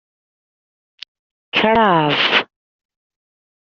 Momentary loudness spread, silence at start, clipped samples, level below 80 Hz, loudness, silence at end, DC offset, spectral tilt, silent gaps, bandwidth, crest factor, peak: 7 LU; 1.55 s; under 0.1%; -54 dBFS; -15 LUFS; 1.25 s; under 0.1%; -1.5 dB/octave; none; 7.2 kHz; 18 dB; -2 dBFS